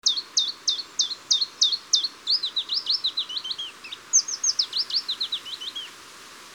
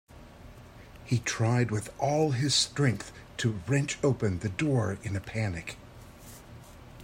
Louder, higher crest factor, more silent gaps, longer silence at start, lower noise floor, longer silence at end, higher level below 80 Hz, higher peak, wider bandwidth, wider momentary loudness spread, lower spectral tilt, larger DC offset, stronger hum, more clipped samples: first, -23 LUFS vs -29 LUFS; about the same, 20 dB vs 18 dB; neither; about the same, 0.05 s vs 0.15 s; second, -45 dBFS vs -49 dBFS; about the same, 0 s vs 0 s; second, -76 dBFS vs -56 dBFS; first, -6 dBFS vs -12 dBFS; first, over 20 kHz vs 16 kHz; second, 13 LU vs 24 LU; second, 3.5 dB/octave vs -5 dB/octave; neither; neither; neither